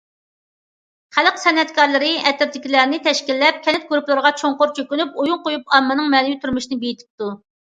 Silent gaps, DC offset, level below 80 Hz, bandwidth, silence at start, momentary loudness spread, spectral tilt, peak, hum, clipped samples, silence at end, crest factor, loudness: 7.10-7.18 s; under 0.1%; -60 dBFS; 9.2 kHz; 1.15 s; 9 LU; -2.5 dB/octave; 0 dBFS; none; under 0.1%; 0.35 s; 18 dB; -17 LUFS